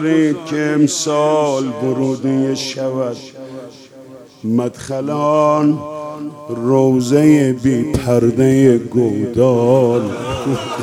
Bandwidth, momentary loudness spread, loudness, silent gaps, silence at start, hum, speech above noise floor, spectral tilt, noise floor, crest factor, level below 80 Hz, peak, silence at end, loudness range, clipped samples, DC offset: 15.5 kHz; 14 LU; -15 LUFS; none; 0 s; none; 24 dB; -6.5 dB/octave; -38 dBFS; 14 dB; -46 dBFS; 0 dBFS; 0 s; 7 LU; under 0.1%; under 0.1%